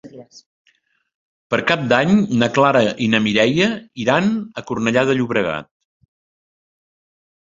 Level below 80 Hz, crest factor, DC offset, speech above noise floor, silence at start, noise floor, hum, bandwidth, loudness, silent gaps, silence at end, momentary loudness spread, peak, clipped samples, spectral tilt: -56 dBFS; 18 dB; under 0.1%; 46 dB; 0.05 s; -62 dBFS; none; 7.8 kHz; -17 LUFS; 0.46-0.65 s, 1.15-1.50 s; 1.95 s; 8 LU; 0 dBFS; under 0.1%; -5.5 dB/octave